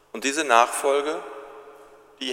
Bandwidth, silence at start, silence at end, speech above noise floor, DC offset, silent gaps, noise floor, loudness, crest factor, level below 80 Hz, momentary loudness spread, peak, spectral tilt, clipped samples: 16 kHz; 0.15 s; 0 s; 28 dB; under 0.1%; none; -49 dBFS; -22 LUFS; 24 dB; -72 dBFS; 21 LU; 0 dBFS; -0.5 dB/octave; under 0.1%